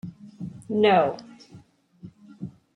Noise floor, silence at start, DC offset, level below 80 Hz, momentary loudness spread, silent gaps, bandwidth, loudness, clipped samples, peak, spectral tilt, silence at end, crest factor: -52 dBFS; 0.05 s; under 0.1%; -68 dBFS; 22 LU; none; 10.5 kHz; -22 LUFS; under 0.1%; -6 dBFS; -7 dB/octave; 0.25 s; 20 dB